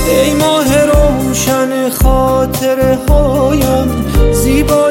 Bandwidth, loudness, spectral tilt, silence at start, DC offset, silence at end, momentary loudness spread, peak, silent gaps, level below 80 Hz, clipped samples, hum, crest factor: 17 kHz; -11 LUFS; -5.5 dB/octave; 0 s; 0.2%; 0 s; 3 LU; 0 dBFS; none; -16 dBFS; under 0.1%; none; 10 dB